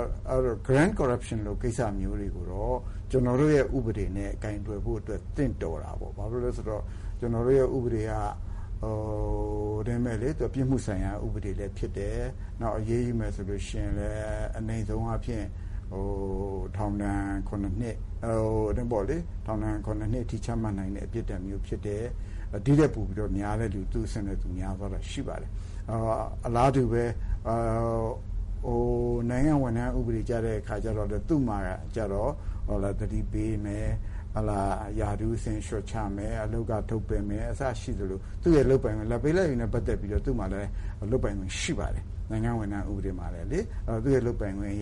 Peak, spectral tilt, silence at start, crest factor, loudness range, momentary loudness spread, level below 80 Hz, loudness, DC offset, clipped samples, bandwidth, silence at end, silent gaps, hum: -12 dBFS; -7.5 dB/octave; 0 s; 18 dB; 5 LU; 10 LU; -34 dBFS; -30 LUFS; under 0.1%; under 0.1%; 11.5 kHz; 0 s; none; none